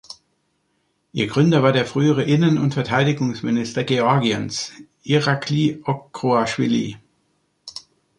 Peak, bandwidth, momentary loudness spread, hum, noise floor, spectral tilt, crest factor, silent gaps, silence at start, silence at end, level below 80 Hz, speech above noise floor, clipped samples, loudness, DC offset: -2 dBFS; 11 kHz; 17 LU; none; -68 dBFS; -6 dB/octave; 18 dB; none; 0.1 s; 0.4 s; -58 dBFS; 49 dB; under 0.1%; -20 LUFS; under 0.1%